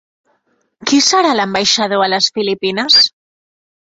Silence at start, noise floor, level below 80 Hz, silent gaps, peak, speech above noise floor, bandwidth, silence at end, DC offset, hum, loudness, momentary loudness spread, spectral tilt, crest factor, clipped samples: 0.8 s; -62 dBFS; -58 dBFS; none; 0 dBFS; 49 dB; 8 kHz; 0.85 s; under 0.1%; none; -12 LUFS; 8 LU; -2 dB/octave; 16 dB; under 0.1%